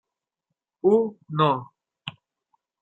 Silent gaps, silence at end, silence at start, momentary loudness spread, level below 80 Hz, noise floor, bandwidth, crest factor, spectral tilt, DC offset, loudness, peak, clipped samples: none; 0.7 s; 0.85 s; 18 LU; -70 dBFS; -83 dBFS; 8 kHz; 22 dB; -8.5 dB/octave; under 0.1%; -23 LUFS; -6 dBFS; under 0.1%